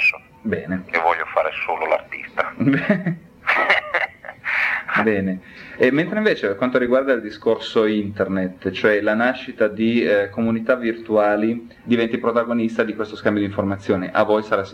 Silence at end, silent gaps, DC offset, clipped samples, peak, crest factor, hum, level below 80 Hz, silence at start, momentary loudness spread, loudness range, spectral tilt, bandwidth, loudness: 0 s; none; under 0.1%; under 0.1%; -2 dBFS; 18 dB; none; -58 dBFS; 0 s; 7 LU; 1 LU; -7 dB/octave; 9.4 kHz; -20 LUFS